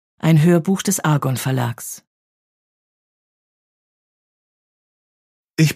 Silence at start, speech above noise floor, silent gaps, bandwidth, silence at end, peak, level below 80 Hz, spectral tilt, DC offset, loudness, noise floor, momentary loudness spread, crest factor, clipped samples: 0.25 s; over 73 dB; 2.07-5.44 s; 15.5 kHz; 0 s; -2 dBFS; -62 dBFS; -5.5 dB/octave; under 0.1%; -18 LUFS; under -90 dBFS; 16 LU; 18 dB; under 0.1%